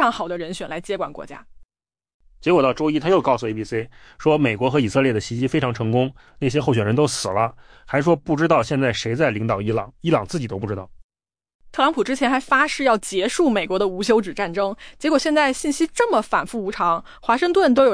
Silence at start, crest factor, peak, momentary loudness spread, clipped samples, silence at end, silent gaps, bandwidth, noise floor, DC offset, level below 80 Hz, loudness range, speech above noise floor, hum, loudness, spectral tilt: 0 s; 16 dB; -6 dBFS; 9 LU; under 0.1%; 0 s; 1.65-1.69 s, 2.14-2.20 s, 11.04-11.09 s, 11.54-11.59 s; 10.5 kHz; under -90 dBFS; under 0.1%; -50 dBFS; 3 LU; over 70 dB; none; -21 LUFS; -5.5 dB/octave